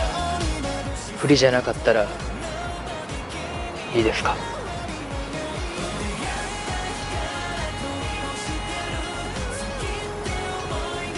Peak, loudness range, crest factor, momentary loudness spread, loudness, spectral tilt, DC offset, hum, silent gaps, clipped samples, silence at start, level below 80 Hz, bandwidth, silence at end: -2 dBFS; 5 LU; 22 dB; 10 LU; -26 LUFS; -4.5 dB/octave; under 0.1%; none; none; under 0.1%; 0 s; -36 dBFS; 11.5 kHz; 0 s